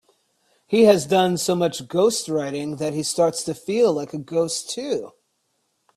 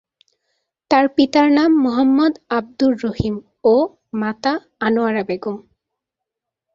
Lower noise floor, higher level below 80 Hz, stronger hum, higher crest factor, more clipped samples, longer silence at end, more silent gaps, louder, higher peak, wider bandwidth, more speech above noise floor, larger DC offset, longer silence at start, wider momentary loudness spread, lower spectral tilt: second, -71 dBFS vs -83 dBFS; second, -64 dBFS vs -48 dBFS; neither; about the same, 20 dB vs 16 dB; neither; second, 0.85 s vs 1.15 s; neither; second, -21 LUFS vs -17 LUFS; about the same, -2 dBFS vs -2 dBFS; first, 14.5 kHz vs 7.2 kHz; second, 50 dB vs 66 dB; neither; second, 0.7 s vs 0.9 s; about the same, 12 LU vs 10 LU; second, -4.5 dB/octave vs -6.5 dB/octave